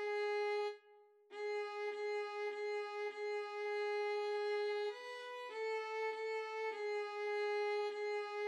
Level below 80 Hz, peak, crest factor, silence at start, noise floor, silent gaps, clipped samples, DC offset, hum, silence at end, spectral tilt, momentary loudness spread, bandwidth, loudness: under -90 dBFS; -30 dBFS; 10 dB; 0 s; -66 dBFS; none; under 0.1%; under 0.1%; none; 0 s; 0 dB/octave; 6 LU; 10.5 kHz; -41 LUFS